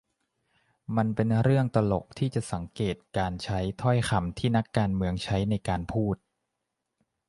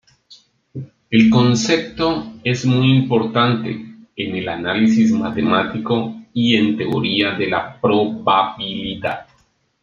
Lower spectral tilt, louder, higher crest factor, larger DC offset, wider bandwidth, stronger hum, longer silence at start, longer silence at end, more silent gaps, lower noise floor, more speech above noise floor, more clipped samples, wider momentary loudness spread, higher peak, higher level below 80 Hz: about the same, -7 dB/octave vs -6 dB/octave; second, -28 LUFS vs -17 LUFS; about the same, 20 dB vs 16 dB; neither; first, 11.5 kHz vs 7.6 kHz; neither; first, 0.9 s vs 0.3 s; first, 1.15 s vs 0.6 s; neither; first, -83 dBFS vs -60 dBFS; first, 56 dB vs 43 dB; neither; second, 8 LU vs 12 LU; second, -8 dBFS vs -2 dBFS; first, -46 dBFS vs -52 dBFS